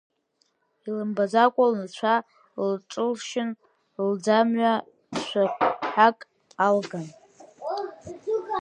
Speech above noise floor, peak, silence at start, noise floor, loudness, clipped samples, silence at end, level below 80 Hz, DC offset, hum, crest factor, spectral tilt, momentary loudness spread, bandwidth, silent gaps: 47 dB; -4 dBFS; 0.85 s; -71 dBFS; -25 LUFS; under 0.1%; 0 s; -72 dBFS; under 0.1%; none; 22 dB; -5 dB/octave; 17 LU; 10 kHz; none